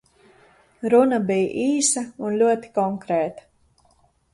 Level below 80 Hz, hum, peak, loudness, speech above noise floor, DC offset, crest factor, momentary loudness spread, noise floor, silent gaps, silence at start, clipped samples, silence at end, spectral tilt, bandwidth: -64 dBFS; none; -4 dBFS; -21 LUFS; 40 dB; under 0.1%; 18 dB; 8 LU; -61 dBFS; none; 0.8 s; under 0.1%; 0.95 s; -4 dB/octave; 11.5 kHz